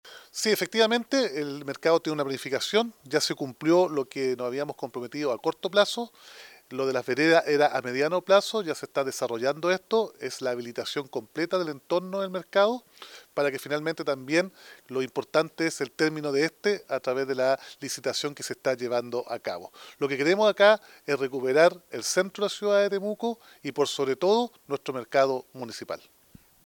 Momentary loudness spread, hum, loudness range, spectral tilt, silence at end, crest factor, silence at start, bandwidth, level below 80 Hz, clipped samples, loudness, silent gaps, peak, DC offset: 12 LU; none; 5 LU; -3.5 dB/octave; 0.7 s; 20 dB; 0.05 s; 19.5 kHz; -80 dBFS; under 0.1%; -27 LUFS; none; -6 dBFS; under 0.1%